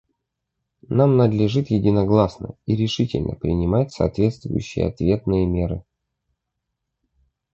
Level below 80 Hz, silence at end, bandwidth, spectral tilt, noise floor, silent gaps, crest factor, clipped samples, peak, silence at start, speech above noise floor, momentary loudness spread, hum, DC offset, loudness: -38 dBFS; 1.75 s; 7.8 kHz; -8 dB/octave; -79 dBFS; none; 18 dB; under 0.1%; -2 dBFS; 0.9 s; 60 dB; 8 LU; none; under 0.1%; -21 LUFS